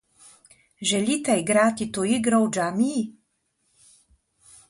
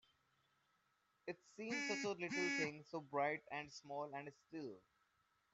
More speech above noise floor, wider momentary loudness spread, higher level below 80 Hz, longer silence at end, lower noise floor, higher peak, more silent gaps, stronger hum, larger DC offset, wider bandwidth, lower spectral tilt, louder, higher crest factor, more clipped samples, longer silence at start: first, 49 dB vs 37 dB; second, 7 LU vs 13 LU; first, -64 dBFS vs -88 dBFS; first, 1.6 s vs 0.75 s; second, -72 dBFS vs -82 dBFS; first, -8 dBFS vs -28 dBFS; neither; neither; neither; first, 11.5 kHz vs 8.2 kHz; about the same, -4 dB/octave vs -3.5 dB/octave; first, -23 LUFS vs -45 LUFS; about the same, 18 dB vs 20 dB; neither; second, 0.8 s vs 1.25 s